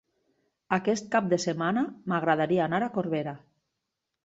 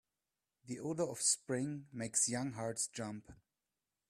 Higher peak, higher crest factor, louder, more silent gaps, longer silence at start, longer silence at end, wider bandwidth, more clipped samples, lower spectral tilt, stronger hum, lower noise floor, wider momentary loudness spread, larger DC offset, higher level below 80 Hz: first, -8 dBFS vs -20 dBFS; about the same, 20 dB vs 20 dB; first, -28 LUFS vs -37 LUFS; neither; about the same, 0.7 s vs 0.65 s; about the same, 0.85 s vs 0.75 s; second, 8 kHz vs 15 kHz; neither; first, -5.5 dB/octave vs -3 dB/octave; neither; second, -84 dBFS vs under -90 dBFS; second, 6 LU vs 12 LU; neither; first, -70 dBFS vs -76 dBFS